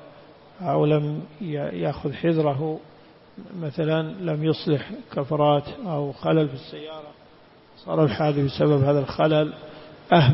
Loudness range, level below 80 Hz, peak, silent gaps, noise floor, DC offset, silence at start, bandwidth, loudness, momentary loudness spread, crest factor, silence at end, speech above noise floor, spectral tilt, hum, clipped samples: 3 LU; -56 dBFS; -4 dBFS; none; -52 dBFS; under 0.1%; 0 s; 5.8 kHz; -24 LUFS; 16 LU; 20 dB; 0 s; 28 dB; -11.5 dB/octave; none; under 0.1%